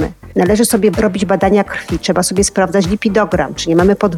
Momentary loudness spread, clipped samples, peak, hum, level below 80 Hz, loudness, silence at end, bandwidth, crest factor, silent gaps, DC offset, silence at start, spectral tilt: 5 LU; under 0.1%; -2 dBFS; none; -34 dBFS; -14 LUFS; 0 s; 16 kHz; 12 dB; none; under 0.1%; 0 s; -5 dB/octave